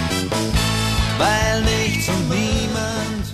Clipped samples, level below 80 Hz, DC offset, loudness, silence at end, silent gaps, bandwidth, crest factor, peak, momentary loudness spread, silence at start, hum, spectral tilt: under 0.1%; -28 dBFS; under 0.1%; -19 LUFS; 0 s; none; 14 kHz; 14 dB; -6 dBFS; 5 LU; 0 s; none; -4 dB/octave